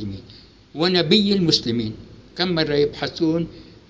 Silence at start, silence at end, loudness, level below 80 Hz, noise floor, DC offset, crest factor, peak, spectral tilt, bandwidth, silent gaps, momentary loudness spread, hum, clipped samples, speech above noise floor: 0 s; 0.25 s; -20 LUFS; -48 dBFS; -46 dBFS; under 0.1%; 20 dB; -2 dBFS; -5.5 dB/octave; 8 kHz; none; 20 LU; none; under 0.1%; 26 dB